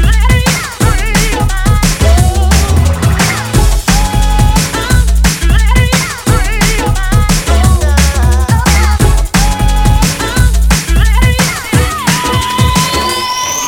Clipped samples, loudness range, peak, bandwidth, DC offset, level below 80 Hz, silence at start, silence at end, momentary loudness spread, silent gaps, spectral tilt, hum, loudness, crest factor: 0.4%; 1 LU; 0 dBFS; 17.5 kHz; under 0.1%; -12 dBFS; 0 s; 0 s; 3 LU; none; -4 dB/octave; none; -10 LUFS; 8 dB